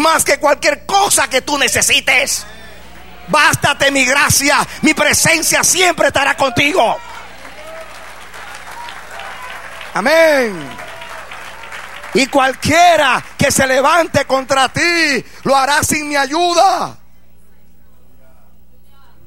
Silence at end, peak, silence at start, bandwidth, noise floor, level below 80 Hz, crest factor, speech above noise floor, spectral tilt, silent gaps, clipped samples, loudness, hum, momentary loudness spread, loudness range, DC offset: 2.35 s; 0 dBFS; 0 s; 16.5 kHz; -49 dBFS; -44 dBFS; 14 dB; 36 dB; -2 dB/octave; none; under 0.1%; -12 LUFS; 60 Hz at -45 dBFS; 20 LU; 7 LU; 2%